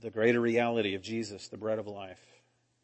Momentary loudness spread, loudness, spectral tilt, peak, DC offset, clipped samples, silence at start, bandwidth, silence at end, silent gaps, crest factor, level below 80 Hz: 16 LU; -31 LUFS; -5.5 dB/octave; -12 dBFS; under 0.1%; under 0.1%; 0 s; 8.6 kHz; 0.7 s; none; 20 dB; -76 dBFS